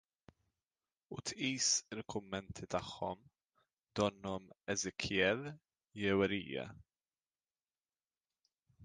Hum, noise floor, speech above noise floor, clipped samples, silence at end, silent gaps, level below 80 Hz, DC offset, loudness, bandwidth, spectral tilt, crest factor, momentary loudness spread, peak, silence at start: none; under -90 dBFS; over 52 dB; under 0.1%; 0 s; 3.73-3.77 s; -66 dBFS; under 0.1%; -38 LUFS; 10 kHz; -3 dB/octave; 24 dB; 13 LU; -18 dBFS; 1.1 s